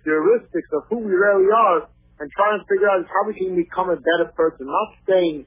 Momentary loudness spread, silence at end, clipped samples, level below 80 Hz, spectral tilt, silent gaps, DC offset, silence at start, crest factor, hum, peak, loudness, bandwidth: 9 LU; 0.05 s; under 0.1%; -56 dBFS; -9 dB/octave; none; under 0.1%; 0.05 s; 14 dB; none; -6 dBFS; -19 LUFS; 3.8 kHz